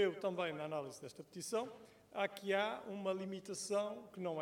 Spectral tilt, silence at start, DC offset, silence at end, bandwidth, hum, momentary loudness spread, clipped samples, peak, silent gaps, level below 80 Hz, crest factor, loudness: -4 dB/octave; 0 s; under 0.1%; 0 s; 17 kHz; none; 12 LU; under 0.1%; -22 dBFS; none; -84 dBFS; 18 dB; -42 LUFS